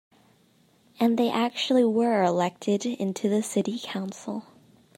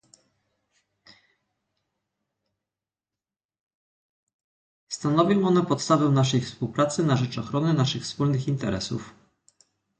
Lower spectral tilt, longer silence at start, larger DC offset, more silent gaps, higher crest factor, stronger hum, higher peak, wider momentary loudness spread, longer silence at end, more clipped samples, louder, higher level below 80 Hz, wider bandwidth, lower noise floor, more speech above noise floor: about the same, -5 dB/octave vs -6 dB/octave; second, 1 s vs 4.9 s; neither; neither; about the same, 16 dB vs 20 dB; neither; second, -10 dBFS vs -6 dBFS; about the same, 11 LU vs 9 LU; second, 0.55 s vs 0.9 s; neither; about the same, -26 LUFS vs -24 LUFS; second, -78 dBFS vs -60 dBFS; first, 16 kHz vs 9.4 kHz; second, -62 dBFS vs under -90 dBFS; second, 37 dB vs over 67 dB